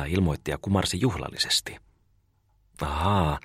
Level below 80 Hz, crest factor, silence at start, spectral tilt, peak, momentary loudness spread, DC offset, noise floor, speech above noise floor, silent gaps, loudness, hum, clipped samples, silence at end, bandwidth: -40 dBFS; 18 dB; 0 s; -4.5 dB/octave; -10 dBFS; 8 LU; under 0.1%; -66 dBFS; 40 dB; none; -26 LUFS; none; under 0.1%; 0.05 s; 15.5 kHz